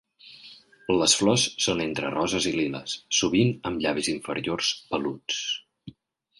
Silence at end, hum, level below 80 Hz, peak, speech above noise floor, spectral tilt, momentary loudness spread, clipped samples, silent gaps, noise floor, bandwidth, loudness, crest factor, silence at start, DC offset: 0.5 s; none; -56 dBFS; -6 dBFS; 33 dB; -3 dB/octave; 12 LU; under 0.1%; none; -58 dBFS; 11.5 kHz; -25 LUFS; 20 dB; 0.25 s; under 0.1%